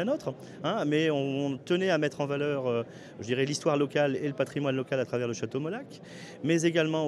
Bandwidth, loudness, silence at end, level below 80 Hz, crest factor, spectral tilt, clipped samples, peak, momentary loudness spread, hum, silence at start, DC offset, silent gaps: 12.5 kHz; -29 LUFS; 0 s; -74 dBFS; 18 dB; -5.5 dB/octave; under 0.1%; -12 dBFS; 11 LU; none; 0 s; under 0.1%; none